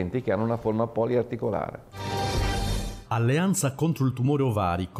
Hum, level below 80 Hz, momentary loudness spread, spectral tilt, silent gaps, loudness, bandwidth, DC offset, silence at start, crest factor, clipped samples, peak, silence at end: none; -38 dBFS; 8 LU; -6 dB/octave; none; -26 LUFS; 16 kHz; under 0.1%; 0 s; 12 dB; under 0.1%; -14 dBFS; 0 s